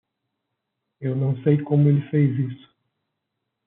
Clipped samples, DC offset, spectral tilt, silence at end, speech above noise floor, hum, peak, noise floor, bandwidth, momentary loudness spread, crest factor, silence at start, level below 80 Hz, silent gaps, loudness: under 0.1%; under 0.1%; -10.5 dB/octave; 1.1 s; 60 dB; none; -6 dBFS; -80 dBFS; 3.7 kHz; 10 LU; 18 dB; 1 s; -68 dBFS; none; -22 LUFS